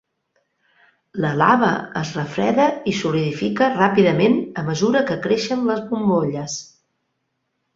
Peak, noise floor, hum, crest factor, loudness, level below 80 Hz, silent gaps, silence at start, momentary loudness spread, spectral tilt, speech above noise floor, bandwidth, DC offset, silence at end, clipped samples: -2 dBFS; -73 dBFS; none; 18 dB; -19 LUFS; -58 dBFS; none; 1.15 s; 10 LU; -5.5 dB/octave; 55 dB; 7.8 kHz; under 0.1%; 1.1 s; under 0.1%